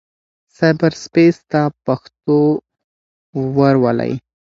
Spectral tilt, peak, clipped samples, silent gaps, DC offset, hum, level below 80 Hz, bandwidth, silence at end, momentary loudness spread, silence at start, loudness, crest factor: -7.5 dB/octave; 0 dBFS; under 0.1%; 2.84-3.33 s; under 0.1%; none; -54 dBFS; 7.6 kHz; 0.4 s; 10 LU; 0.6 s; -16 LUFS; 16 dB